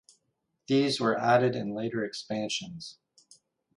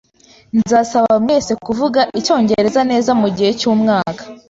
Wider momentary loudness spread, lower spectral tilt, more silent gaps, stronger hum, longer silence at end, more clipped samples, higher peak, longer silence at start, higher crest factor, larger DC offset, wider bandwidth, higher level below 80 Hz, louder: first, 15 LU vs 5 LU; about the same, -5 dB/octave vs -5 dB/octave; neither; neither; first, 0.85 s vs 0.15 s; neither; second, -10 dBFS vs -2 dBFS; first, 0.7 s vs 0.55 s; first, 20 dB vs 12 dB; neither; first, 11.5 kHz vs 8 kHz; second, -72 dBFS vs -50 dBFS; second, -28 LUFS vs -15 LUFS